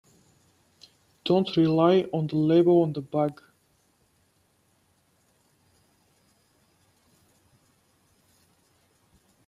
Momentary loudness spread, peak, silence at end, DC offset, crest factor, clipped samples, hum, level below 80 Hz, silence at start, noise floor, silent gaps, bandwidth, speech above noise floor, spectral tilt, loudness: 8 LU; -8 dBFS; 6.15 s; under 0.1%; 22 dB; under 0.1%; none; -70 dBFS; 1.25 s; -67 dBFS; none; 10.5 kHz; 45 dB; -8.5 dB/octave; -23 LUFS